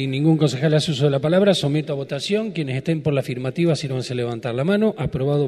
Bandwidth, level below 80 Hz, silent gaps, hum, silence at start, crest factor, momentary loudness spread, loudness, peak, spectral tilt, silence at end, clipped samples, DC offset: 12.5 kHz; -50 dBFS; none; none; 0 s; 16 dB; 8 LU; -21 LUFS; -4 dBFS; -6.5 dB/octave; 0 s; under 0.1%; under 0.1%